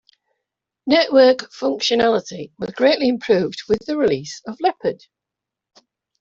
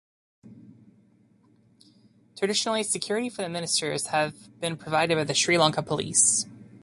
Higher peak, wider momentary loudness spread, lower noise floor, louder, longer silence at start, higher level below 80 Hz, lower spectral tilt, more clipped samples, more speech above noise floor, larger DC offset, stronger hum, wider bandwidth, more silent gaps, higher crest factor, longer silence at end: first, -2 dBFS vs -6 dBFS; first, 16 LU vs 11 LU; first, -85 dBFS vs -61 dBFS; first, -18 LUFS vs -25 LUFS; first, 0.85 s vs 0.45 s; first, -58 dBFS vs -66 dBFS; first, -4.5 dB/octave vs -2.5 dB/octave; neither; first, 67 dB vs 35 dB; neither; neither; second, 7.6 kHz vs 11.5 kHz; neither; about the same, 18 dB vs 22 dB; first, 1.25 s vs 0.05 s